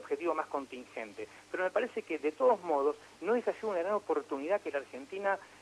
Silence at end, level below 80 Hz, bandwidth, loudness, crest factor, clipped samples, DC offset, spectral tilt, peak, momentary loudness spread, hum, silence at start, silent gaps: 0.05 s; -78 dBFS; 12 kHz; -34 LUFS; 18 dB; under 0.1%; under 0.1%; -5 dB/octave; -16 dBFS; 13 LU; none; 0 s; none